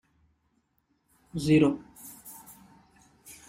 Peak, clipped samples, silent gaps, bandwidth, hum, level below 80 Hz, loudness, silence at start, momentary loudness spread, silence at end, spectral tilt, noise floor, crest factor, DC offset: -10 dBFS; under 0.1%; none; 16 kHz; none; -58 dBFS; -26 LUFS; 1.35 s; 24 LU; 0.15 s; -6.5 dB/octave; -73 dBFS; 20 dB; under 0.1%